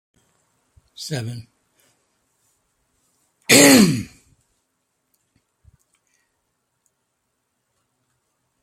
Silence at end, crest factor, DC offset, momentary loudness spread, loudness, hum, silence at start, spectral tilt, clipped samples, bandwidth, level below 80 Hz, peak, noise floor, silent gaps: 4.6 s; 24 dB; under 0.1%; 27 LU; -14 LUFS; none; 1 s; -3 dB/octave; under 0.1%; 16.5 kHz; -60 dBFS; 0 dBFS; -74 dBFS; none